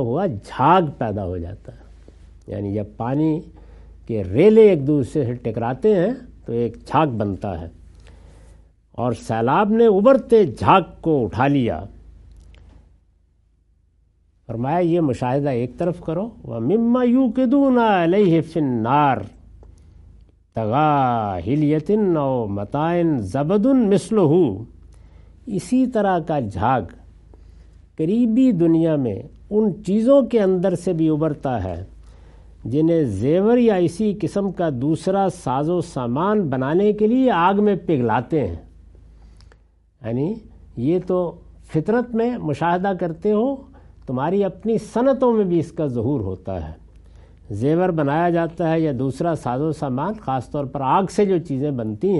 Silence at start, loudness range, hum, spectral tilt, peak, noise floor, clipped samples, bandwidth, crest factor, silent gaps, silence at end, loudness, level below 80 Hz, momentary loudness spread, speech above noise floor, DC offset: 0 s; 6 LU; none; -8 dB/octave; 0 dBFS; -59 dBFS; under 0.1%; 11.5 kHz; 20 dB; none; 0 s; -19 LUFS; -48 dBFS; 12 LU; 41 dB; under 0.1%